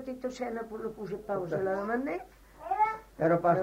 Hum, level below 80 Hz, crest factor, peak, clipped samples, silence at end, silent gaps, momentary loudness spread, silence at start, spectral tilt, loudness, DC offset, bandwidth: none; -60 dBFS; 18 dB; -12 dBFS; under 0.1%; 0 s; none; 12 LU; 0 s; -7.5 dB/octave; -32 LUFS; under 0.1%; 16 kHz